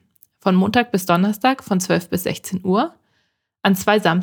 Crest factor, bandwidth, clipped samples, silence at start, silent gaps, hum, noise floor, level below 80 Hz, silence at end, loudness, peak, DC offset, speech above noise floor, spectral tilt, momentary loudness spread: 18 dB; over 20 kHz; under 0.1%; 0.45 s; none; none; -69 dBFS; -60 dBFS; 0 s; -19 LUFS; 0 dBFS; under 0.1%; 51 dB; -5.5 dB/octave; 8 LU